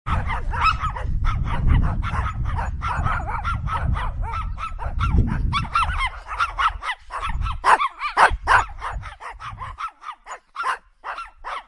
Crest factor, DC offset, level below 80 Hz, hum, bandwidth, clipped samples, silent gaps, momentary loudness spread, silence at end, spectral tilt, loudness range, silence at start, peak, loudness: 22 dB; under 0.1%; -28 dBFS; none; 11.5 kHz; under 0.1%; none; 15 LU; 0.05 s; -5.5 dB/octave; 5 LU; 0.05 s; -2 dBFS; -23 LUFS